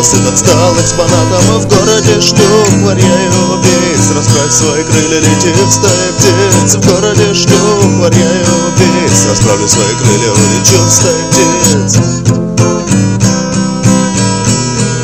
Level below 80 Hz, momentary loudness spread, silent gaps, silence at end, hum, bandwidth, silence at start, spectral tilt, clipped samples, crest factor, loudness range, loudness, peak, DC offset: -32 dBFS; 4 LU; none; 0 s; none; 16 kHz; 0 s; -4 dB/octave; 1%; 8 dB; 2 LU; -7 LUFS; 0 dBFS; under 0.1%